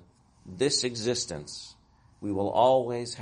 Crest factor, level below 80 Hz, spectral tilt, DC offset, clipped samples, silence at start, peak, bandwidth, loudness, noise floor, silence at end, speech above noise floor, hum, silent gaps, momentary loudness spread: 20 dB; -62 dBFS; -3.5 dB/octave; under 0.1%; under 0.1%; 0.45 s; -10 dBFS; 10.5 kHz; -27 LUFS; -53 dBFS; 0 s; 26 dB; none; none; 19 LU